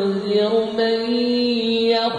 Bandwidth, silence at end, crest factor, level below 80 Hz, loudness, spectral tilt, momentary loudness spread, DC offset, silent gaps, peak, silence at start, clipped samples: 10 kHz; 0 s; 12 dB; -62 dBFS; -19 LUFS; -6 dB/octave; 2 LU; under 0.1%; none; -8 dBFS; 0 s; under 0.1%